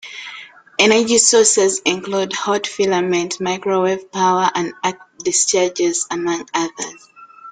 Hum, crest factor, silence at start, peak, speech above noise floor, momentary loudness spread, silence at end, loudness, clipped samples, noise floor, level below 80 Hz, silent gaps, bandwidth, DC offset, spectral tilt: none; 18 dB; 0.05 s; 0 dBFS; 21 dB; 14 LU; 0 s; -16 LUFS; under 0.1%; -38 dBFS; -62 dBFS; none; 10 kHz; under 0.1%; -2 dB/octave